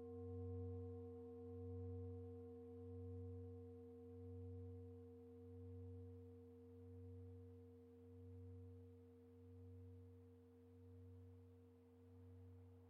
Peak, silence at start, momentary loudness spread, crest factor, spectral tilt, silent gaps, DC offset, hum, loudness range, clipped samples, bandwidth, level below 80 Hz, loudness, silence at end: -42 dBFS; 0 s; 13 LU; 14 dB; -11.5 dB/octave; none; under 0.1%; none; 10 LU; under 0.1%; 3.5 kHz; -78 dBFS; -58 LUFS; 0 s